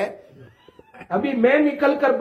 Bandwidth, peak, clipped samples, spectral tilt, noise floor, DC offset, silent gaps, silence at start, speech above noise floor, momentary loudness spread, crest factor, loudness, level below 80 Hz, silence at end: 6.6 kHz; -4 dBFS; under 0.1%; -7 dB/octave; -46 dBFS; under 0.1%; none; 0 s; 26 dB; 10 LU; 18 dB; -20 LUFS; -64 dBFS; 0 s